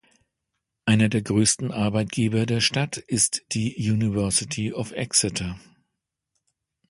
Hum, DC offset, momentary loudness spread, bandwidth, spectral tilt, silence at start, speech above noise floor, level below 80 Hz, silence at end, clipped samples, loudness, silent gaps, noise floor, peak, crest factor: none; under 0.1%; 8 LU; 11.5 kHz; -4 dB/octave; 0.85 s; 58 dB; -50 dBFS; 1.3 s; under 0.1%; -23 LUFS; none; -81 dBFS; -4 dBFS; 20 dB